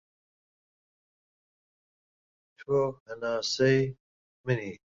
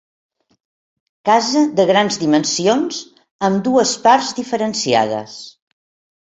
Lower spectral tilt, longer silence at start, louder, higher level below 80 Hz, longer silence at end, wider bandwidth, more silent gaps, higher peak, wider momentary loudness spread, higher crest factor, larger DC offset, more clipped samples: first, -5.5 dB/octave vs -3.5 dB/octave; first, 2.6 s vs 1.25 s; second, -29 LUFS vs -16 LUFS; about the same, -66 dBFS vs -62 dBFS; second, 0.1 s vs 0.8 s; about the same, 7.8 kHz vs 8.4 kHz; first, 3.00-3.06 s, 4.00-4.44 s vs 3.31-3.39 s; second, -12 dBFS vs -2 dBFS; about the same, 12 LU vs 10 LU; about the same, 20 dB vs 16 dB; neither; neither